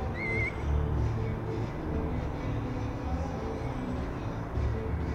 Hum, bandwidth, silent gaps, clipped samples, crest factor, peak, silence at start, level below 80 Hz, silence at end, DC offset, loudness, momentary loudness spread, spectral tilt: none; 8.6 kHz; none; under 0.1%; 14 dB; -18 dBFS; 0 s; -36 dBFS; 0 s; under 0.1%; -33 LUFS; 5 LU; -8 dB/octave